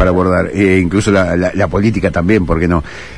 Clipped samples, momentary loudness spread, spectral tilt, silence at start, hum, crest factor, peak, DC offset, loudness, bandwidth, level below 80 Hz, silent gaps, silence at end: under 0.1%; 3 LU; -7 dB/octave; 0 s; none; 12 dB; 0 dBFS; 1%; -13 LUFS; 10.5 kHz; -28 dBFS; none; 0 s